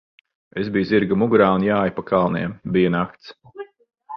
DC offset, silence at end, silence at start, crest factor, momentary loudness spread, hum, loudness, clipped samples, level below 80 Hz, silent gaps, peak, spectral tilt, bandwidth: under 0.1%; 0 s; 0.55 s; 18 dB; 23 LU; none; -20 LUFS; under 0.1%; -52 dBFS; none; -2 dBFS; -9.5 dB/octave; 5.8 kHz